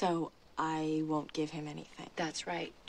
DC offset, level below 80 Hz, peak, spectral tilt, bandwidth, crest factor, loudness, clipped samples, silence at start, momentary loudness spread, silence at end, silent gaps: under 0.1%; -68 dBFS; -20 dBFS; -5 dB/octave; 11 kHz; 18 dB; -37 LUFS; under 0.1%; 0 s; 10 LU; 0 s; none